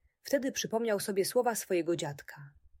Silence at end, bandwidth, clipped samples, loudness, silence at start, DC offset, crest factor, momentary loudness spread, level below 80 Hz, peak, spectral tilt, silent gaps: 0.3 s; 16.5 kHz; under 0.1%; -32 LUFS; 0.25 s; under 0.1%; 16 dB; 15 LU; -70 dBFS; -16 dBFS; -4 dB/octave; none